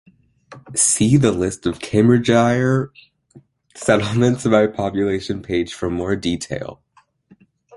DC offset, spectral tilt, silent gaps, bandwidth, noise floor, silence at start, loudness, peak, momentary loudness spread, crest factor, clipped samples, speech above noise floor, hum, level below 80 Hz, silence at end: under 0.1%; -5 dB/octave; none; 11.5 kHz; -55 dBFS; 0.5 s; -18 LUFS; -2 dBFS; 11 LU; 18 dB; under 0.1%; 38 dB; none; -46 dBFS; 1 s